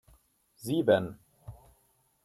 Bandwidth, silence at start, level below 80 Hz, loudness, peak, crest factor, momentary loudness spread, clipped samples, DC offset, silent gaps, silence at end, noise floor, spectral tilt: 15 kHz; 0.6 s; -62 dBFS; -28 LUFS; -12 dBFS; 22 dB; 25 LU; under 0.1%; under 0.1%; none; 0.7 s; -70 dBFS; -6 dB/octave